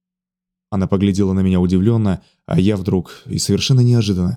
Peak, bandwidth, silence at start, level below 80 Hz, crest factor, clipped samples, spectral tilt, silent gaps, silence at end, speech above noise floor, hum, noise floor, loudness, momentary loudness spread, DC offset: -2 dBFS; 14 kHz; 0.7 s; -48 dBFS; 14 dB; under 0.1%; -6.5 dB/octave; none; 0 s; 70 dB; none; -85 dBFS; -17 LUFS; 8 LU; under 0.1%